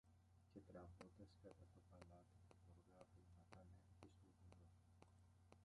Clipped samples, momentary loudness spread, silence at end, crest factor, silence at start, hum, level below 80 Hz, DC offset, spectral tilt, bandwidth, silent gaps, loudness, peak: under 0.1%; 6 LU; 0 s; 24 dB; 0.05 s; none; -76 dBFS; under 0.1%; -6.5 dB/octave; 11 kHz; none; -67 LUFS; -44 dBFS